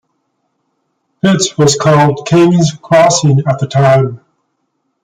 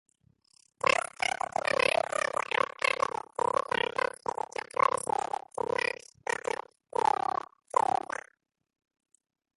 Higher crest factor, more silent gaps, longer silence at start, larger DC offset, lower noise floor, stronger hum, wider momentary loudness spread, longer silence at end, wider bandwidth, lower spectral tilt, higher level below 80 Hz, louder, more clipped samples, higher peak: second, 12 dB vs 22 dB; neither; first, 1.25 s vs 0.85 s; neither; second, -66 dBFS vs -70 dBFS; neither; second, 5 LU vs 9 LU; second, 0.85 s vs 2.5 s; second, 9.6 kHz vs 12 kHz; first, -5.5 dB/octave vs -2 dB/octave; first, -50 dBFS vs -70 dBFS; first, -10 LUFS vs -31 LUFS; neither; first, 0 dBFS vs -10 dBFS